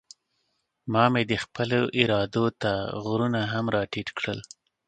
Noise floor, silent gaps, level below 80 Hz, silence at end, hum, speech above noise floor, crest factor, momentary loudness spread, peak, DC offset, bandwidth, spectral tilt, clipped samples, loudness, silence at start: -75 dBFS; none; -56 dBFS; 0.45 s; none; 50 dB; 26 dB; 9 LU; -2 dBFS; under 0.1%; 9.2 kHz; -6 dB/octave; under 0.1%; -26 LUFS; 0.85 s